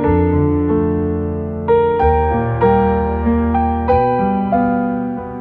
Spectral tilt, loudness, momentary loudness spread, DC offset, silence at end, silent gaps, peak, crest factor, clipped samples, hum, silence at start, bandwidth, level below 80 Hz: -11.5 dB/octave; -16 LUFS; 6 LU; under 0.1%; 0 s; none; -2 dBFS; 14 dB; under 0.1%; none; 0 s; 4.3 kHz; -26 dBFS